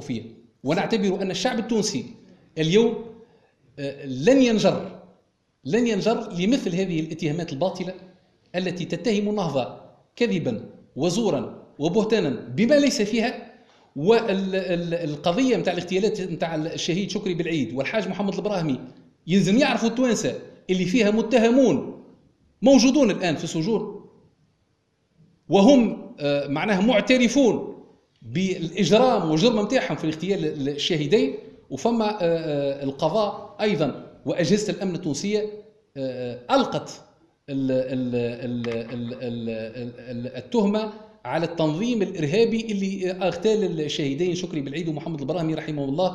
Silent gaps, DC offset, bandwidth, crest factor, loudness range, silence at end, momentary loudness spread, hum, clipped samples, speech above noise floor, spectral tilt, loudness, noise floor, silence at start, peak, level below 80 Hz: none; under 0.1%; 11.5 kHz; 20 dB; 6 LU; 0 s; 14 LU; none; under 0.1%; 46 dB; -5.5 dB/octave; -23 LUFS; -68 dBFS; 0 s; -4 dBFS; -56 dBFS